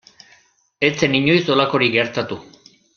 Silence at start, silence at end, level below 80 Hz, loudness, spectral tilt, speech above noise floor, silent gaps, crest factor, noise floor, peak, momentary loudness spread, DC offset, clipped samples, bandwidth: 0.8 s; 0.55 s; -56 dBFS; -17 LUFS; -5 dB/octave; 38 dB; none; 20 dB; -56 dBFS; 0 dBFS; 11 LU; under 0.1%; under 0.1%; 7 kHz